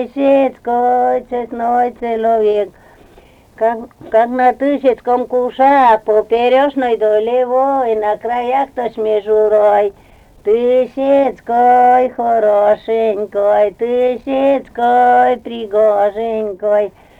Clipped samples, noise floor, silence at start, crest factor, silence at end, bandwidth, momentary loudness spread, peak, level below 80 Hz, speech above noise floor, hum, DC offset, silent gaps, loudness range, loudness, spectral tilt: under 0.1%; -44 dBFS; 0 s; 12 dB; 0.3 s; 8.4 kHz; 7 LU; -2 dBFS; -50 dBFS; 31 dB; none; under 0.1%; none; 3 LU; -14 LUFS; -6 dB/octave